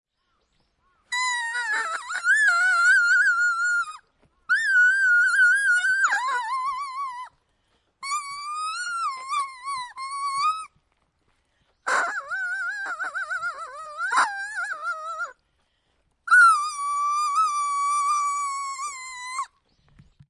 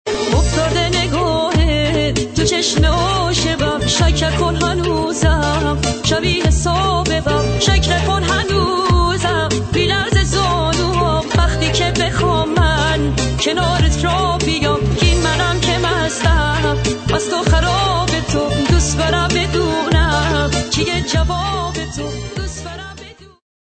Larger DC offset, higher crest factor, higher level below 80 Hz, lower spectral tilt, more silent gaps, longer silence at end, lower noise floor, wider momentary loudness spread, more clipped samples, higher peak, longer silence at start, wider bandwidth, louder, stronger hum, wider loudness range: neither; about the same, 18 dB vs 14 dB; second, -72 dBFS vs -22 dBFS; second, 2 dB/octave vs -4.5 dB/octave; neither; first, 0.85 s vs 0.35 s; first, -71 dBFS vs -37 dBFS; first, 16 LU vs 3 LU; neither; second, -8 dBFS vs -2 dBFS; first, 1.1 s vs 0.05 s; first, 11.5 kHz vs 9 kHz; second, -22 LUFS vs -16 LUFS; neither; first, 10 LU vs 1 LU